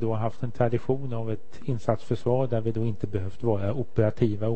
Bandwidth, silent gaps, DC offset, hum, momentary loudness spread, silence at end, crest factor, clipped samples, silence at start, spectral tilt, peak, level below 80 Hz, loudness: 8.4 kHz; none; 3%; none; 7 LU; 0 s; 20 dB; under 0.1%; 0 s; -9.5 dB/octave; -6 dBFS; -52 dBFS; -28 LUFS